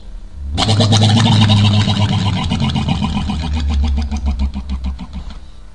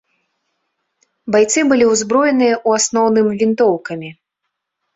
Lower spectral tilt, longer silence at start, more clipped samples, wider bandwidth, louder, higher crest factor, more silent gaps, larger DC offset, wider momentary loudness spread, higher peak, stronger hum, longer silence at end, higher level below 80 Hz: first, -5.5 dB/octave vs -3.5 dB/octave; second, 0 s vs 1.25 s; neither; first, 10.5 kHz vs 8 kHz; about the same, -15 LUFS vs -14 LUFS; about the same, 16 dB vs 14 dB; neither; first, 2% vs under 0.1%; about the same, 15 LU vs 14 LU; about the same, 0 dBFS vs -2 dBFS; neither; second, 0.05 s vs 0.85 s; first, -24 dBFS vs -58 dBFS